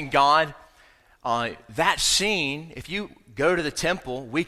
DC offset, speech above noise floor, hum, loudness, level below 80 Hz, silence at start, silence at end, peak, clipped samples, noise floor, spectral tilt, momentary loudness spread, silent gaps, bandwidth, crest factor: under 0.1%; 32 dB; none; -23 LUFS; -50 dBFS; 0 s; 0 s; -4 dBFS; under 0.1%; -56 dBFS; -2.5 dB/octave; 13 LU; none; 16 kHz; 20 dB